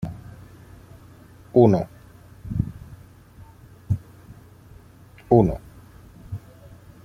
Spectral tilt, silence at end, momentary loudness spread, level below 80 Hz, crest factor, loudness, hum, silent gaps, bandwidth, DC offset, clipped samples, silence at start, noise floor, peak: -10 dB/octave; 0.7 s; 26 LU; -44 dBFS; 24 dB; -22 LUFS; none; none; 14.5 kHz; under 0.1%; under 0.1%; 0 s; -48 dBFS; -2 dBFS